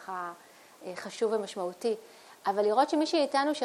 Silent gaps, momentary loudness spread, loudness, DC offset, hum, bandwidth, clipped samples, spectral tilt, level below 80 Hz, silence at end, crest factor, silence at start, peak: none; 15 LU; -30 LUFS; under 0.1%; none; 15 kHz; under 0.1%; -4 dB/octave; -84 dBFS; 0 s; 18 dB; 0 s; -12 dBFS